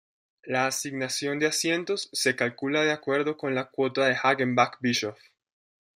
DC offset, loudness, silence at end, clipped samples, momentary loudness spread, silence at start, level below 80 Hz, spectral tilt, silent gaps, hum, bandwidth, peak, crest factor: under 0.1%; -26 LUFS; 0.8 s; under 0.1%; 6 LU; 0.45 s; -74 dBFS; -3.5 dB/octave; none; none; 16 kHz; -6 dBFS; 20 dB